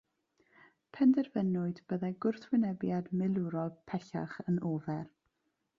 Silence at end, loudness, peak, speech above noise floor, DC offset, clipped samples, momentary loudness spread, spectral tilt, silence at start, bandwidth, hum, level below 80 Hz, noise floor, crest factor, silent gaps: 0.7 s; -34 LUFS; -18 dBFS; 49 dB; under 0.1%; under 0.1%; 12 LU; -9.5 dB/octave; 0.95 s; 7.2 kHz; none; -74 dBFS; -82 dBFS; 16 dB; none